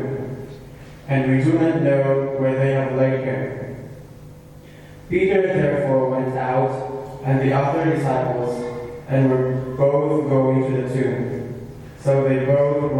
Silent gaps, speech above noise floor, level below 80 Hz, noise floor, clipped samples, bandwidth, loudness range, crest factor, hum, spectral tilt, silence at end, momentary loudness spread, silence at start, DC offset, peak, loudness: none; 23 dB; -48 dBFS; -42 dBFS; under 0.1%; 10.5 kHz; 3 LU; 16 dB; none; -9 dB/octave; 0 s; 15 LU; 0 s; under 0.1%; -4 dBFS; -20 LUFS